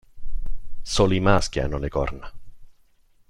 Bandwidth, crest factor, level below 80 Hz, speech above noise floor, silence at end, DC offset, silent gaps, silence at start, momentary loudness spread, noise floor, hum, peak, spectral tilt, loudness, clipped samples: 11 kHz; 20 dB; -32 dBFS; 36 dB; 0.6 s; under 0.1%; none; 0.15 s; 22 LU; -57 dBFS; none; -2 dBFS; -5 dB/octave; -23 LUFS; under 0.1%